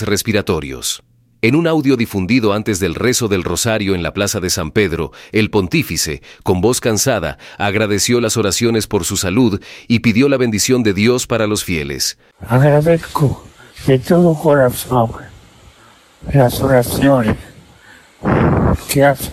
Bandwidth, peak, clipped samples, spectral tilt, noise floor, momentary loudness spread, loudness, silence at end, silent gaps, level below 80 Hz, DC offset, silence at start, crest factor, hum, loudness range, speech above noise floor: 16.5 kHz; 0 dBFS; under 0.1%; -5 dB/octave; -46 dBFS; 8 LU; -15 LUFS; 0 s; none; -36 dBFS; under 0.1%; 0 s; 14 dB; none; 2 LU; 32 dB